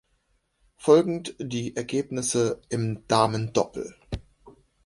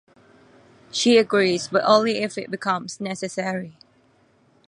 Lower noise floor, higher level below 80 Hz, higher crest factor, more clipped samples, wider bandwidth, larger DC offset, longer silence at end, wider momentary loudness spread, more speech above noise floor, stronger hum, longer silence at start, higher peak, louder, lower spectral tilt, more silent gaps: first, -70 dBFS vs -60 dBFS; first, -52 dBFS vs -70 dBFS; about the same, 20 dB vs 22 dB; neither; about the same, 11.5 kHz vs 11.5 kHz; neither; second, 0.35 s vs 0.95 s; first, 17 LU vs 13 LU; first, 46 dB vs 38 dB; neither; second, 0.8 s vs 0.95 s; second, -6 dBFS vs -2 dBFS; second, -25 LUFS vs -21 LUFS; about the same, -5 dB/octave vs -4 dB/octave; neither